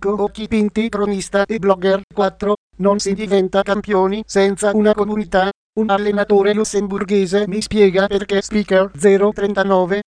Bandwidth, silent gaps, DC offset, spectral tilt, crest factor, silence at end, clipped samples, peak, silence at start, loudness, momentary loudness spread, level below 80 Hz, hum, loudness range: 10.5 kHz; 2.03-2.08 s, 2.57-2.70 s, 5.55-5.73 s; under 0.1%; -5.5 dB/octave; 16 dB; 0.05 s; under 0.1%; 0 dBFS; 0 s; -17 LUFS; 5 LU; -44 dBFS; none; 2 LU